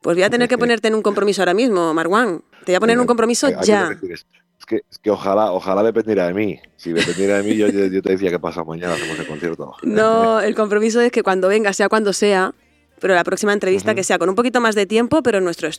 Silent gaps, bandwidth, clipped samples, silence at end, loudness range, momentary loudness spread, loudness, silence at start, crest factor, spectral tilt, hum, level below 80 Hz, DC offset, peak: none; 14.5 kHz; under 0.1%; 0 s; 3 LU; 10 LU; -17 LUFS; 0.05 s; 16 dB; -4.5 dB/octave; none; -60 dBFS; under 0.1%; -2 dBFS